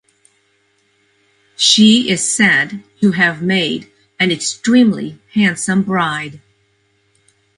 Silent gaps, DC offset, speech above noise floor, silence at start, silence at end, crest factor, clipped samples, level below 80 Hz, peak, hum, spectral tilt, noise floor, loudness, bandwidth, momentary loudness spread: none; under 0.1%; 46 dB; 1.6 s; 1.2 s; 16 dB; under 0.1%; -58 dBFS; 0 dBFS; none; -3.5 dB/octave; -60 dBFS; -14 LUFS; 11.5 kHz; 12 LU